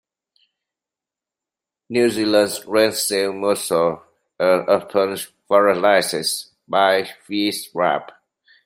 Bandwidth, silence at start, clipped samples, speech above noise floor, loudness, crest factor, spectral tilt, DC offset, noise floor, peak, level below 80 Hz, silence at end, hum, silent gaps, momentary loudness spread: 16 kHz; 1.9 s; under 0.1%; 70 dB; -19 LUFS; 18 dB; -3 dB/octave; under 0.1%; -88 dBFS; -2 dBFS; -66 dBFS; 0.6 s; none; none; 7 LU